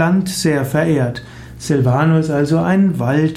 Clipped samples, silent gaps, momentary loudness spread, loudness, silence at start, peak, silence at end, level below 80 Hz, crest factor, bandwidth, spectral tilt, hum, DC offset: under 0.1%; none; 9 LU; -15 LUFS; 0 s; -4 dBFS; 0 s; -44 dBFS; 12 dB; 15.5 kHz; -6.5 dB/octave; none; under 0.1%